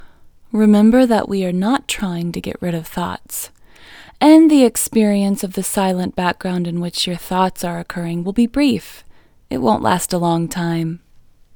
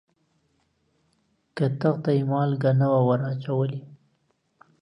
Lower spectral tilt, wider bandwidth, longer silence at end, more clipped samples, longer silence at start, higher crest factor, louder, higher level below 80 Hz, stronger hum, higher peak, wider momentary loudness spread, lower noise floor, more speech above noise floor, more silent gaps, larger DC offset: second, -5.5 dB/octave vs -10 dB/octave; first, over 20 kHz vs 5.8 kHz; second, 0.6 s vs 0.85 s; neither; second, 0 s vs 1.55 s; about the same, 16 dB vs 18 dB; first, -17 LUFS vs -24 LUFS; first, -46 dBFS vs -70 dBFS; neither; first, 0 dBFS vs -8 dBFS; first, 13 LU vs 8 LU; second, -47 dBFS vs -70 dBFS; second, 31 dB vs 47 dB; neither; neither